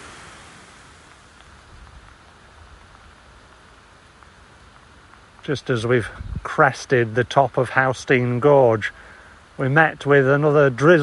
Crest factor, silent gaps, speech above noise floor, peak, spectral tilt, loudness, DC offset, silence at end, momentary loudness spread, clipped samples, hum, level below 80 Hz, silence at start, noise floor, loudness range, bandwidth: 20 dB; none; 31 dB; -2 dBFS; -6.5 dB/octave; -18 LUFS; under 0.1%; 0 s; 15 LU; under 0.1%; none; -48 dBFS; 0 s; -49 dBFS; 10 LU; 11.5 kHz